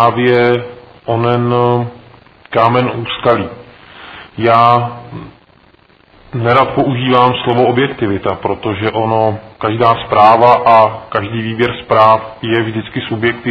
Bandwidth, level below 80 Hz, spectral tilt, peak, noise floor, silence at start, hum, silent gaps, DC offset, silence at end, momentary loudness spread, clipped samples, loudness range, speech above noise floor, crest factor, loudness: 5.4 kHz; -48 dBFS; -9 dB/octave; 0 dBFS; -47 dBFS; 0 s; none; none; under 0.1%; 0 s; 13 LU; 0.5%; 5 LU; 35 dB; 12 dB; -12 LUFS